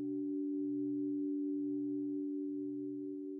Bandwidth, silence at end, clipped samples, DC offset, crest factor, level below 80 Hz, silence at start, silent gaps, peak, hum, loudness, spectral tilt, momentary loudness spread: 0.8 kHz; 0 s; under 0.1%; under 0.1%; 8 dB; under -90 dBFS; 0 s; none; -32 dBFS; none; -39 LUFS; -14.5 dB/octave; 4 LU